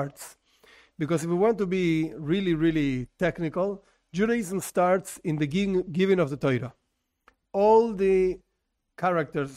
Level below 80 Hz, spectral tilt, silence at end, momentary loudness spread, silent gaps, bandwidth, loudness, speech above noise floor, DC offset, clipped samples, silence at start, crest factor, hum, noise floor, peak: -54 dBFS; -6.5 dB/octave; 0 s; 11 LU; none; 15.5 kHz; -26 LUFS; 53 dB; under 0.1%; under 0.1%; 0 s; 18 dB; none; -78 dBFS; -8 dBFS